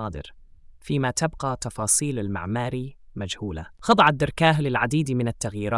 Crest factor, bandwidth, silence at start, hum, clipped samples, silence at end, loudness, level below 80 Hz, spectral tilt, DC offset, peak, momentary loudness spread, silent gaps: 20 dB; 12 kHz; 0 s; none; under 0.1%; 0 s; -24 LUFS; -46 dBFS; -4.5 dB/octave; under 0.1%; -6 dBFS; 15 LU; none